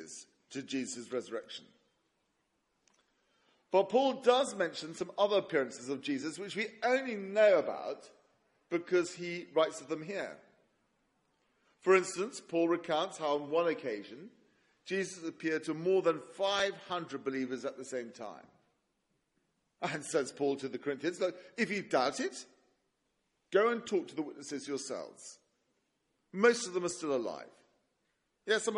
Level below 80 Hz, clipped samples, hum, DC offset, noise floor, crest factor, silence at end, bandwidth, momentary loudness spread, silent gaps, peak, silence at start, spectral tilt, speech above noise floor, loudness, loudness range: -84 dBFS; under 0.1%; none; under 0.1%; -80 dBFS; 22 dB; 0 s; 11.5 kHz; 15 LU; none; -12 dBFS; 0 s; -3.5 dB/octave; 47 dB; -34 LUFS; 7 LU